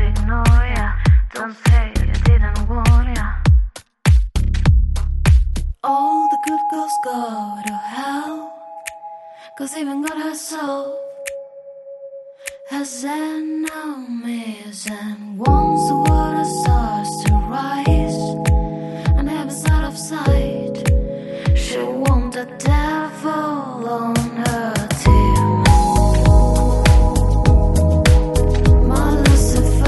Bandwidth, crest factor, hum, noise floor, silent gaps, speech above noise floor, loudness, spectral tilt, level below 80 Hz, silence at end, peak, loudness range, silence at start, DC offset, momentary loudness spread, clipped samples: 12 kHz; 16 dB; none; -37 dBFS; none; 17 dB; -18 LUFS; -6 dB/octave; -18 dBFS; 0 s; 0 dBFS; 12 LU; 0 s; under 0.1%; 15 LU; under 0.1%